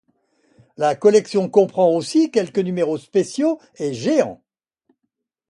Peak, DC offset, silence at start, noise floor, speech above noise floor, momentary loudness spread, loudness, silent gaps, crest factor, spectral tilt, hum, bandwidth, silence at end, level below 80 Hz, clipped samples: -2 dBFS; under 0.1%; 0.8 s; -77 dBFS; 59 dB; 7 LU; -19 LUFS; none; 18 dB; -6 dB/octave; none; 11.5 kHz; 1.15 s; -66 dBFS; under 0.1%